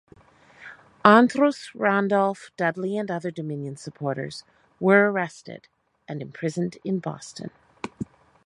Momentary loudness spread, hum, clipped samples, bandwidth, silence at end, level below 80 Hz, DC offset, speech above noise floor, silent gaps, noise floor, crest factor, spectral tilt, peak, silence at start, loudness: 23 LU; none; under 0.1%; 11 kHz; 0.4 s; -68 dBFS; under 0.1%; 30 dB; none; -54 dBFS; 24 dB; -6.5 dB/octave; 0 dBFS; 0.6 s; -23 LUFS